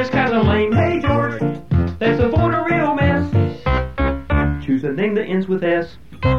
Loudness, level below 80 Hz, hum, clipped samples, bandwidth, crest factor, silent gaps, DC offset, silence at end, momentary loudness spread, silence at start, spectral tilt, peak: -18 LUFS; -28 dBFS; none; under 0.1%; 6.8 kHz; 14 dB; none; 1%; 0 s; 5 LU; 0 s; -8.5 dB/octave; -4 dBFS